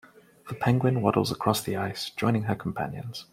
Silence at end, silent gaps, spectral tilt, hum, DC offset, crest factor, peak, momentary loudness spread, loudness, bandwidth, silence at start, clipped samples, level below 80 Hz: 0.1 s; none; -6 dB/octave; none; under 0.1%; 22 dB; -6 dBFS; 10 LU; -27 LUFS; 16 kHz; 0.45 s; under 0.1%; -60 dBFS